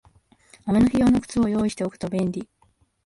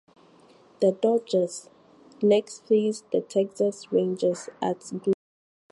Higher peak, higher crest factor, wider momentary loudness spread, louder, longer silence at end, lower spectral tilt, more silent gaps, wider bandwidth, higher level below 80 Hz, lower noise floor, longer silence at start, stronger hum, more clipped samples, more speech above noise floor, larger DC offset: about the same, -10 dBFS vs -10 dBFS; about the same, 14 dB vs 16 dB; first, 11 LU vs 8 LU; first, -22 LUFS vs -26 LUFS; about the same, 0.6 s vs 0.6 s; about the same, -7 dB/octave vs -6 dB/octave; neither; about the same, 11.5 kHz vs 11.5 kHz; first, -46 dBFS vs -76 dBFS; first, -63 dBFS vs -55 dBFS; second, 0.65 s vs 0.8 s; neither; neither; first, 42 dB vs 31 dB; neither